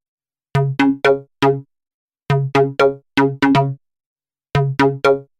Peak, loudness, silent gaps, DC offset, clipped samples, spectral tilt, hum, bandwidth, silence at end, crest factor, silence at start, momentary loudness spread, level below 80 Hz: 0 dBFS; -17 LUFS; 1.94-2.08 s, 4.06-4.16 s; under 0.1%; under 0.1%; -7 dB/octave; none; 10 kHz; 0.15 s; 18 dB; 0.55 s; 8 LU; -48 dBFS